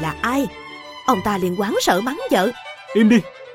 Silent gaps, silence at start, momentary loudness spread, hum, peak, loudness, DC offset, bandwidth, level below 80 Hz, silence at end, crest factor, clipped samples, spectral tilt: none; 0 s; 12 LU; none; -2 dBFS; -19 LUFS; under 0.1%; 16.5 kHz; -48 dBFS; 0 s; 18 dB; under 0.1%; -5 dB/octave